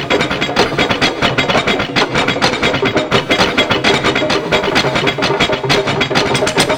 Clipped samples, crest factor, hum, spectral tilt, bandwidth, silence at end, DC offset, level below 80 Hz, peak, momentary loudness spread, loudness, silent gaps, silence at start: under 0.1%; 14 dB; none; -4 dB/octave; over 20 kHz; 0 s; under 0.1%; -38 dBFS; 0 dBFS; 2 LU; -13 LUFS; none; 0 s